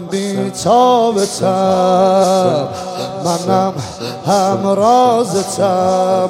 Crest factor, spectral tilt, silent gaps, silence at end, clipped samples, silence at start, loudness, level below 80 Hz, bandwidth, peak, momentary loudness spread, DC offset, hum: 12 dB; -5 dB/octave; none; 0 s; under 0.1%; 0 s; -14 LUFS; -56 dBFS; 16 kHz; 0 dBFS; 10 LU; under 0.1%; none